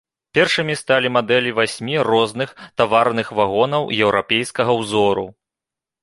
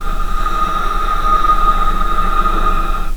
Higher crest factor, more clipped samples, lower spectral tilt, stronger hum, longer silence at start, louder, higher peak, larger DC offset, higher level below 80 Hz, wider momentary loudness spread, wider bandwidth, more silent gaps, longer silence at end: first, 18 dB vs 12 dB; neither; about the same, -4.5 dB/octave vs -5 dB/octave; neither; first, 0.35 s vs 0 s; about the same, -18 LUFS vs -16 LUFS; about the same, 0 dBFS vs 0 dBFS; neither; second, -56 dBFS vs -16 dBFS; about the same, 6 LU vs 6 LU; second, 11.5 kHz vs 14 kHz; neither; first, 0.7 s vs 0 s